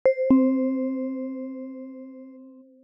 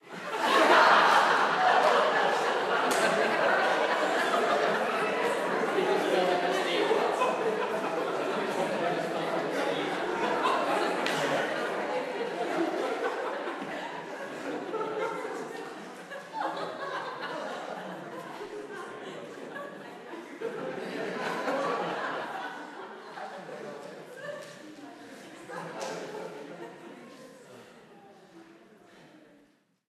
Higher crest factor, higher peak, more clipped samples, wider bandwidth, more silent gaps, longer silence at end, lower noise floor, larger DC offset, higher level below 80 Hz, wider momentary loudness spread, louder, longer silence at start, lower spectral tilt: about the same, 16 dB vs 20 dB; about the same, -8 dBFS vs -10 dBFS; neither; second, 5.4 kHz vs 14.5 kHz; neither; second, 0.2 s vs 0.7 s; second, -48 dBFS vs -65 dBFS; neither; first, -64 dBFS vs -80 dBFS; first, 23 LU vs 19 LU; first, -24 LUFS vs -28 LUFS; about the same, 0.05 s vs 0.05 s; first, -10.5 dB/octave vs -3.5 dB/octave